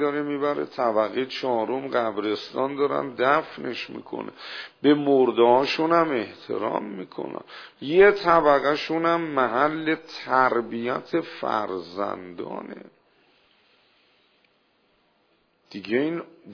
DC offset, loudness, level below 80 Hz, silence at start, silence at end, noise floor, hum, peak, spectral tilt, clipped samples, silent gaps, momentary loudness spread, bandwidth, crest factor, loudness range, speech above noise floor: under 0.1%; -23 LUFS; -64 dBFS; 0 s; 0 s; -66 dBFS; none; -4 dBFS; -6.5 dB/octave; under 0.1%; none; 17 LU; 5.4 kHz; 20 dB; 12 LU; 42 dB